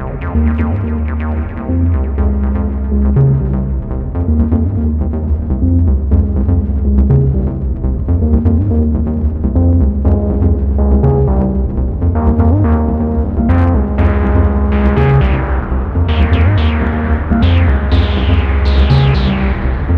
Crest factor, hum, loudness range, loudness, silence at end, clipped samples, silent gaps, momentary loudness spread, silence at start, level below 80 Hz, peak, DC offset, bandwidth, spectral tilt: 10 dB; none; 2 LU; -13 LUFS; 0 s; under 0.1%; none; 6 LU; 0 s; -14 dBFS; -2 dBFS; under 0.1%; 5 kHz; -10 dB/octave